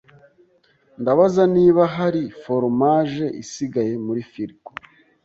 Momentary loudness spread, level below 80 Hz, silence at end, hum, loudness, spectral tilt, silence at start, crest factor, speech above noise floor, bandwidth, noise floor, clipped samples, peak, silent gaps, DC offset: 17 LU; -60 dBFS; 0.75 s; none; -19 LUFS; -7.5 dB/octave; 1 s; 18 dB; 40 dB; 7.8 kHz; -59 dBFS; under 0.1%; -2 dBFS; none; under 0.1%